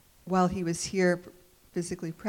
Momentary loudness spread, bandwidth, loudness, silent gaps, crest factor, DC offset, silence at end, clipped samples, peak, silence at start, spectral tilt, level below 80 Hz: 10 LU; 16.5 kHz; -29 LUFS; none; 18 dB; under 0.1%; 0 s; under 0.1%; -12 dBFS; 0.25 s; -5.5 dB/octave; -58 dBFS